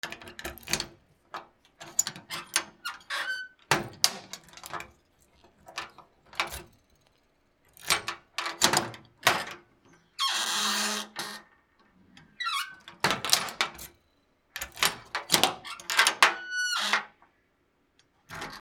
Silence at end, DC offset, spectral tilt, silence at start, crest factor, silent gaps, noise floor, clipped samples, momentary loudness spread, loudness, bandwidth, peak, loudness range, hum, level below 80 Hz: 0 s; under 0.1%; -0.5 dB/octave; 0.05 s; 32 dB; none; -70 dBFS; under 0.1%; 20 LU; -28 LUFS; over 20 kHz; 0 dBFS; 8 LU; none; -62 dBFS